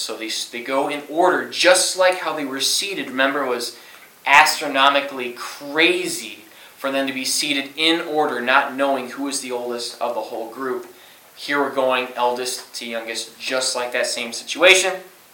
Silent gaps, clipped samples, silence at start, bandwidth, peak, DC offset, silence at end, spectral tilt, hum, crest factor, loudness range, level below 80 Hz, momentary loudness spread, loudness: none; under 0.1%; 0 s; 17.5 kHz; 0 dBFS; under 0.1%; 0.25 s; -1 dB/octave; none; 20 dB; 6 LU; -72 dBFS; 14 LU; -19 LUFS